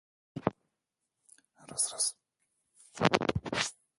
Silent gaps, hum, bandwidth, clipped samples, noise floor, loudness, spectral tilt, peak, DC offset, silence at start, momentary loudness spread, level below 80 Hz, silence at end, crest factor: none; none; 12 kHz; under 0.1%; -86 dBFS; -32 LUFS; -3 dB/octave; -6 dBFS; under 0.1%; 0.35 s; 12 LU; -58 dBFS; 0.3 s; 30 dB